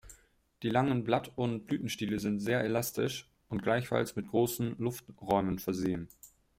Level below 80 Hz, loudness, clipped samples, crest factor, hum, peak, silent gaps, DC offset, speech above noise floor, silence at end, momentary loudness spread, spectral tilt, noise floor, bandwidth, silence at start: -62 dBFS; -33 LUFS; under 0.1%; 20 dB; none; -14 dBFS; none; under 0.1%; 31 dB; 0.3 s; 7 LU; -5.5 dB/octave; -63 dBFS; 16.5 kHz; 0.05 s